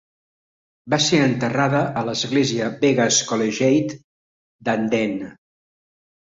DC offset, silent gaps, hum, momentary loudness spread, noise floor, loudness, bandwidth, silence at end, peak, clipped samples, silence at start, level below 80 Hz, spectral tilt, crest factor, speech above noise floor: under 0.1%; 4.04-4.59 s; none; 11 LU; under -90 dBFS; -20 LUFS; 8 kHz; 1.05 s; -4 dBFS; under 0.1%; 0.85 s; -60 dBFS; -4 dB/octave; 18 dB; over 70 dB